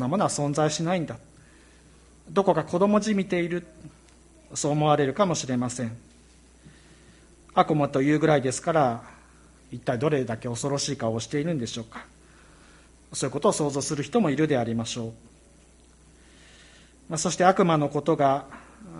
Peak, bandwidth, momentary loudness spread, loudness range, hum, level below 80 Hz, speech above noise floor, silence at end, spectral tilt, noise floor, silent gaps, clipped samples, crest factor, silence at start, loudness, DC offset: -4 dBFS; 11.5 kHz; 13 LU; 4 LU; none; -58 dBFS; 30 dB; 0 s; -5 dB/octave; -55 dBFS; none; under 0.1%; 22 dB; 0 s; -25 LUFS; under 0.1%